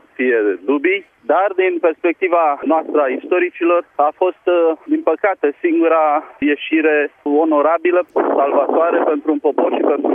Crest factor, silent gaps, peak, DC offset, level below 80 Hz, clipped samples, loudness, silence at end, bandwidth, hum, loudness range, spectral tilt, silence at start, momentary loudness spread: 14 dB; none; -2 dBFS; under 0.1%; -66 dBFS; under 0.1%; -16 LUFS; 0 s; 3.7 kHz; none; 1 LU; -7 dB/octave; 0.2 s; 4 LU